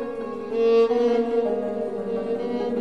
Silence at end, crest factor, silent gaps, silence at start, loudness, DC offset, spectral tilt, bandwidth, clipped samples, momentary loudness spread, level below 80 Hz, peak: 0 s; 12 dB; none; 0 s; -23 LUFS; 0.4%; -7 dB/octave; 6.4 kHz; under 0.1%; 10 LU; -58 dBFS; -10 dBFS